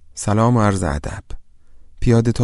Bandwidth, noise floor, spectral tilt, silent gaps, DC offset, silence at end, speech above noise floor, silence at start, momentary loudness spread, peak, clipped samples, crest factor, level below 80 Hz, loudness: 11.5 kHz; -41 dBFS; -7 dB/octave; none; under 0.1%; 0 s; 25 dB; 0.15 s; 14 LU; -2 dBFS; under 0.1%; 16 dB; -32 dBFS; -18 LUFS